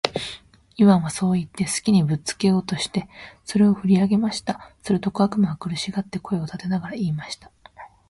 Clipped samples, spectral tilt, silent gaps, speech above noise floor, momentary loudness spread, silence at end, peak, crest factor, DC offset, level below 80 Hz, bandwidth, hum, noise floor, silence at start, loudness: under 0.1%; -6 dB/octave; none; 24 dB; 14 LU; 0.2 s; 0 dBFS; 22 dB; under 0.1%; -54 dBFS; 11.5 kHz; none; -46 dBFS; 0.05 s; -22 LUFS